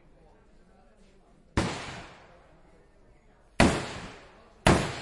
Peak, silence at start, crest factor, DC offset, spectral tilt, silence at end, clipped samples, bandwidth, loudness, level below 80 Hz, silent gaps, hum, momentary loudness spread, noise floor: -6 dBFS; 1.55 s; 26 dB; under 0.1%; -5 dB/octave; 0 s; under 0.1%; 11.5 kHz; -27 LUFS; -44 dBFS; none; none; 21 LU; -58 dBFS